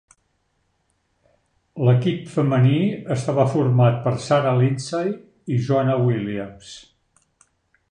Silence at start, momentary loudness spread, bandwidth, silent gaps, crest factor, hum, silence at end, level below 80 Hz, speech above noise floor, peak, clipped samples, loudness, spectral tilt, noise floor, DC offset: 1.75 s; 15 LU; 9.8 kHz; none; 18 dB; none; 1.1 s; -58 dBFS; 49 dB; -4 dBFS; under 0.1%; -20 LUFS; -7.5 dB/octave; -69 dBFS; under 0.1%